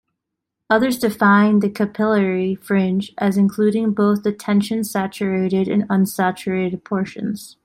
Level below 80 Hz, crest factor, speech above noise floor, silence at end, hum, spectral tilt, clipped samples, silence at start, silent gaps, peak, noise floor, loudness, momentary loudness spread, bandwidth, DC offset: -60 dBFS; 16 dB; 62 dB; 0.15 s; none; -6.5 dB/octave; under 0.1%; 0.7 s; none; -2 dBFS; -80 dBFS; -19 LUFS; 8 LU; 16 kHz; under 0.1%